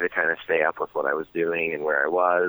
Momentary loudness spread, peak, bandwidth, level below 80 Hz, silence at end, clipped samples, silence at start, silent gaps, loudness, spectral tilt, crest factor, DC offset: 5 LU; -8 dBFS; over 20 kHz; -68 dBFS; 0 s; under 0.1%; 0 s; none; -24 LUFS; -7.5 dB/octave; 16 dB; under 0.1%